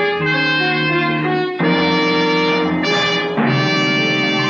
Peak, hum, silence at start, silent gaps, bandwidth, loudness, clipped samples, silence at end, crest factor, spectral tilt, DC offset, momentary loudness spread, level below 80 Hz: -4 dBFS; none; 0 s; none; 7.4 kHz; -15 LUFS; under 0.1%; 0 s; 12 dB; -5 dB/octave; under 0.1%; 2 LU; -54 dBFS